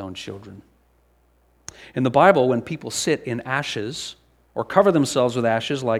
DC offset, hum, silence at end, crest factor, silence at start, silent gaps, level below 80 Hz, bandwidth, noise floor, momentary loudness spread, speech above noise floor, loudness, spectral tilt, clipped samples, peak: under 0.1%; none; 0 s; 22 dB; 0 s; none; -60 dBFS; 15 kHz; -60 dBFS; 20 LU; 40 dB; -21 LUFS; -5 dB/octave; under 0.1%; 0 dBFS